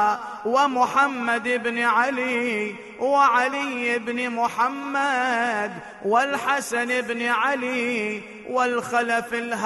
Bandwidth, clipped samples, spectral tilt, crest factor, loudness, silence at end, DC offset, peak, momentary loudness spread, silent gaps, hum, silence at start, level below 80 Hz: 12 kHz; under 0.1%; -3 dB/octave; 16 dB; -23 LUFS; 0 s; under 0.1%; -8 dBFS; 8 LU; none; none; 0 s; -70 dBFS